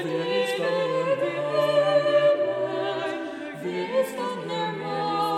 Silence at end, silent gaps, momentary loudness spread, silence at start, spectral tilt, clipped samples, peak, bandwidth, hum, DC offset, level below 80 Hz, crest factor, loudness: 0 s; none; 10 LU; 0 s; -5 dB/octave; under 0.1%; -10 dBFS; 14 kHz; none; under 0.1%; -76 dBFS; 14 dB; -25 LUFS